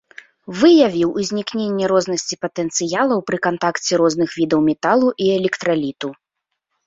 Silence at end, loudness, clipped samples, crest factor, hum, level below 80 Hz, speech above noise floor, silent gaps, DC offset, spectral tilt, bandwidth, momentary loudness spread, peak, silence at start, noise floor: 0.75 s; -18 LUFS; under 0.1%; 16 dB; none; -58 dBFS; 61 dB; none; under 0.1%; -4.5 dB/octave; 7.8 kHz; 9 LU; -2 dBFS; 0.5 s; -78 dBFS